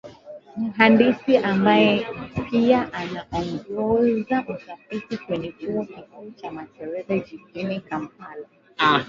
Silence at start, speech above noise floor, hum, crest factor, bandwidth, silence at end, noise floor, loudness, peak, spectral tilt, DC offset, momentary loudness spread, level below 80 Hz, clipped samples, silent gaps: 0.05 s; 20 dB; none; 22 dB; 7.2 kHz; 0 s; -42 dBFS; -22 LUFS; 0 dBFS; -7 dB/octave; under 0.1%; 21 LU; -54 dBFS; under 0.1%; none